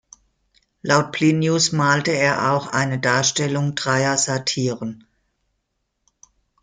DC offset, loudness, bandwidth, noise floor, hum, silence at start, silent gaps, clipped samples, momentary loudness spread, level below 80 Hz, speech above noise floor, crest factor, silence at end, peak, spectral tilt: under 0.1%; -19 LUFS; 9.6 kHz; -74 dBFS; none; 0.85 s; none; under 0.1%; 6 LU; -60 dBFS; 55 dB; 20 dB; 1.65 s; -2 dBFS; -4 dB/octave